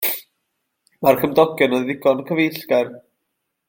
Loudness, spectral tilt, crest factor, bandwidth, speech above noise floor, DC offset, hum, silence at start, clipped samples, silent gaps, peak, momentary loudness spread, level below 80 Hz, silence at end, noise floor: -19 LUFS; -5 dB/octave; 18 dB; 17 kHz; 58 dB; under 0.1%; none; 0 s; under 0.1%; none; -2 dBFS; 6 LU; -62 dBFS; 0.7 s; -76 dBFS